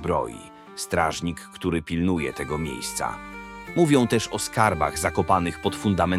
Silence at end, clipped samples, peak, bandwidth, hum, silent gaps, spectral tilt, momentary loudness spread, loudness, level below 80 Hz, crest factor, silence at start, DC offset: 0 s; under 0.1%; -4 dBFS; 16 kHz; none; none; -5 dB/octave; 14 LU; -24 LUFS; -48 dBFS; 20 dB; 0 s; under 0.1%